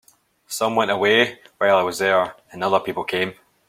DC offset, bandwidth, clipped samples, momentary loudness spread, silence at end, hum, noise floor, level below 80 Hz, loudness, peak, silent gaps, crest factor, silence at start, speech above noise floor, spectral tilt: under 0.1%; 16.5 kHz; under 0.1%; 10 LU; 0.35 s; none; -44 dBFS; -64 dBFS; -20 LUFS; -2 dBFS; none; 18 dB; 0.5 s; 24 dB; -3.5 dB/octave